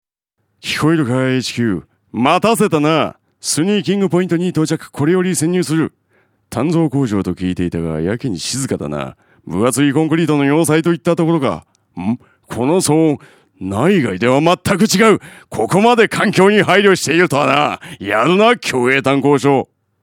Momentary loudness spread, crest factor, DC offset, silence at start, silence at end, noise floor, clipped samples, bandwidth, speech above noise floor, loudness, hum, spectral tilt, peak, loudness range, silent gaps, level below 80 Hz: 12 LU; 14 dB; under 0.1%; 0.65 s; 0.4 s; -69 dBFS; under 0.1%; 17.5 kHz; 55 dB; -15 LUFS; none; -5 dB/octave; 0 dBFS; 6 LU; none; -50 dBFS